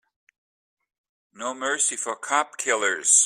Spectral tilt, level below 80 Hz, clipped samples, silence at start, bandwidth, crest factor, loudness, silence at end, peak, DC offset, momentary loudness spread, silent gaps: 1.5 dB/octave; -78 dBFS; under 0.1%; 1.35 s; 15.5 kHz; 22 dB; -23 LUFS; 0 s; -4 dBFS; under 0.1%; 9 LU; none